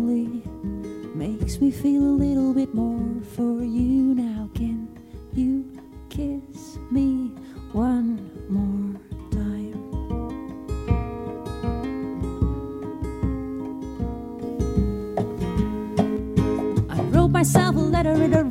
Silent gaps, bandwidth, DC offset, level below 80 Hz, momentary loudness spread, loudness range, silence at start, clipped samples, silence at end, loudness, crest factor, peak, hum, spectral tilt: none; 16 kHz; under 0.1%; -34 dBFS; 13 LU; 7 LU; 0 s; under 0.1%; 0 s; -25 LUFS; 18 dB; -6 dBFS; none; -7 dB/octave